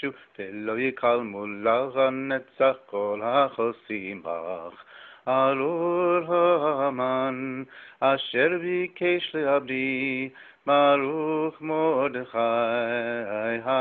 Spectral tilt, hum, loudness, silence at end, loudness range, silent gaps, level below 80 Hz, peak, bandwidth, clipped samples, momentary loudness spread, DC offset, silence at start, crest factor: -9 dB/octave; none; -25 LUFS; 0 s; 2 LU; none; -70 dBFS; -10 dBFS; 4.4 kHz; under 0.1%; 12 LU; under 0.1%; 0 s; 16 dB